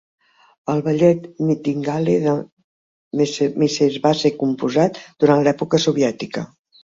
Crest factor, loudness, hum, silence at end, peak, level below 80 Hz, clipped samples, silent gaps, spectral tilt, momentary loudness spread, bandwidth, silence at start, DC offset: 18 dB; -19 LUFS; none; 0.4 s; -2 dBFS; -60 dBFS; under 0.1%; 2.52-2.57 s, 2.64-3.11 s; -6 dB/octave; 10 LU; 7.8 kHz; 0.65 s; under 0.1%